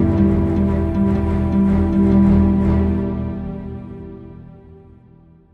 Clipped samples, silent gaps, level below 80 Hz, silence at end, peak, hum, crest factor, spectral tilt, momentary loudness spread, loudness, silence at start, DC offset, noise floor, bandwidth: under 0.1%; none; -26 dBFS; 1.1 s; -2 dBFS; none; 14 dB; -11 dB/octave; 20 LU; -17 LUFS; 0 s; under 0.1%; -47 dBFS; 4.4 kHz